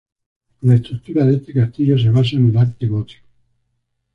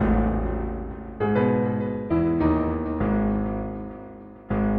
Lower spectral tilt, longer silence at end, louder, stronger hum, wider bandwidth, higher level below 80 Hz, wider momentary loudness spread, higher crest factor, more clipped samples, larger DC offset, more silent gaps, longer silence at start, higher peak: second, -9.5 dB/octave vs -11.5 dB/octave; first, 1 s vs 0 s; first, -16 LUFS vs -25 LUFS; neither; first, 5.2 kHz vs 4.4 kHz; second, -48 dBFS vs -34 dBFS; second, 8 LU vs 14 LU; about the same, 14 dB vs 16 dB; neither; neither; neither; first, 0.65 s vs 0 s; first, -2 dBFS vs -8 dBFS